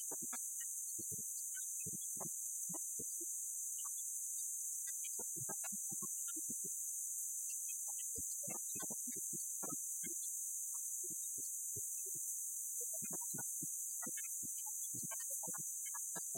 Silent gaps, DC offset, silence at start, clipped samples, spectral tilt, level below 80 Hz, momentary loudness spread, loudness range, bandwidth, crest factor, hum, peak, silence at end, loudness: none; under 0.1%; 0 s; under 0.1%; -1.5 dB/octave; -84 dBFS; 1 LU; 1 LU; 16.5 kHz; 14 dB; none; -30 dBFS; 0 s; -41 LUFS